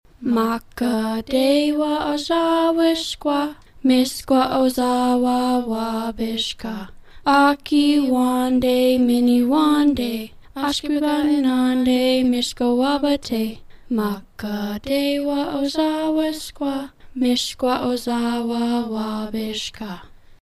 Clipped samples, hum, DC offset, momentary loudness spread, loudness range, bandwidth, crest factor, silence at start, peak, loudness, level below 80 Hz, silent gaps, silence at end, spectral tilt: under 0.1%; none; under 0.1%; 10 LU; 5 LU; 14.5 kHz; 16 dB; 0.2 s; -4 dBFS; -20 LUFS; -48 dBFS; none; 0.1 s; -4.5 dB/octave